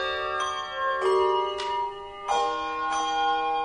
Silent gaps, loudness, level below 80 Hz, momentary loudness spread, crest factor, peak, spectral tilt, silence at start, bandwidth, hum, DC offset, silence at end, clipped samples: none; -27 LUFS; -58 dBFS; 6 LU; 14 dB; -14 dBFS; -2 dB/octave; 0 s; 10.5 kHz; none; under 0.1%; 0 s; under 0.1%